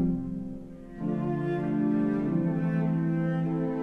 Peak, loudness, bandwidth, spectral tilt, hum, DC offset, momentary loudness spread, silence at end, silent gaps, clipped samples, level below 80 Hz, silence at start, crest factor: -16 dBFS; -29 LUFS; 3.7 kHz; -10.5 dB/octave; none; under 0.1%; 10 LU; 0 s; none; under 0.1%; -52 dBFS; 0 s; 12 dB